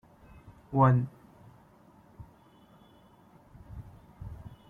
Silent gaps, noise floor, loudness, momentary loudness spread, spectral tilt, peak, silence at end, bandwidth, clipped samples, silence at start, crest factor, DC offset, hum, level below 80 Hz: none; -59 dBFS; -27 LUFS; 29 LU; -10.5 dB/octave; -10 dBFS; 0.2 s; 3.7 kHz; under 0.1%; 0.7 s; 24 dB; under 0.1%; none; -56 dBFS